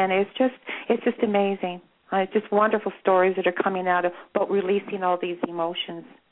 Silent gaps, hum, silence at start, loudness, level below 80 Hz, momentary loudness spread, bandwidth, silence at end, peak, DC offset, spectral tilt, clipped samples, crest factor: none; none; 0 s; -24 LUFS; -74 dBFS; 9 LU; 4.1 kHz; 0.3 s; -8 dBFS; under 0.1%; -9.5 dB/octave; under 0.1%; 16 dB